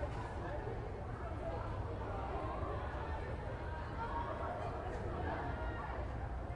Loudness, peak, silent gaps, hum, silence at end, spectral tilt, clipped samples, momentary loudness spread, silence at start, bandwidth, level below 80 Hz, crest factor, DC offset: -43 LUFS; -28 dBFS; none; none; 0 s; -7.5 dB/octave; under 0.1%; 3 LU; 0 s; 10.5 kHz; -46 dBFS; 14 dB; under 0.1%